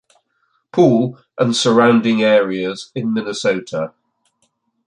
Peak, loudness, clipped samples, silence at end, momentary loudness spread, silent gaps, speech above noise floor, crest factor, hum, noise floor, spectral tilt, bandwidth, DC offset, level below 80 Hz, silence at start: -2 dBFS; -16 LUFS; under 0.1%; 1 s; 12 LU; none; 50 dB; 16 dB; none; -66 dBFS; -5.5 dB/octave; 10 kHz; under 0.1%; -62 dBFS; 0.75 s